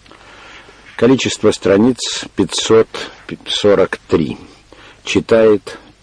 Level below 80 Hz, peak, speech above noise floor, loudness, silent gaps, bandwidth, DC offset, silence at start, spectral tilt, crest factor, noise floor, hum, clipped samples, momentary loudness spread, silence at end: -46 dBFS; -2 dBFS; 28 dB; -14 LUFS; none; 10.5 kHz; under 0.1%; 0.55 s; -4.5 dB/octave; 14 dB; -42 dBFS; none; under 0.1%; 17 LU; 0.25 s